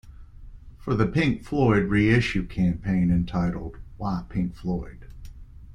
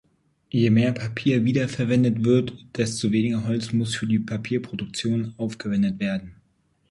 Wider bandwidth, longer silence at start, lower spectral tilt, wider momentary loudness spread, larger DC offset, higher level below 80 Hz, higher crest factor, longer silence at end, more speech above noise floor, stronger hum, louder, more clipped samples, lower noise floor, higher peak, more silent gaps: second, 9.8 kHz vs 11.5 kHz; second, 0.05 s vs 0.55 s; first, -8 dB/octave vs -6.5 dB/octave; first, 13 LU vs 8 LU; neither; first, -40 dBFS vs -56 dBFS; about the same, 20 dB vs 16 dB; second, 0 s vs 0.6 s; second, 19 dB vs 44 dB; neither; about the same, -24 LUFS vs -24 LUFS; neither; second, -43 dBFS vs -66 dBFS; about the same, -6 dBFS vs -8 dBFS; neither